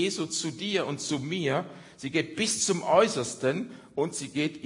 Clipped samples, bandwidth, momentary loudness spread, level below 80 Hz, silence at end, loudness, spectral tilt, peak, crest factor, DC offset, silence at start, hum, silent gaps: under 0.1%; 11 kHz; 9 LU; -70 dBFS; 0 s; -28 LUFS; -3.5 dB/octave; -8 dBFS; 20 dB; under 0.1%; 0 s; none; none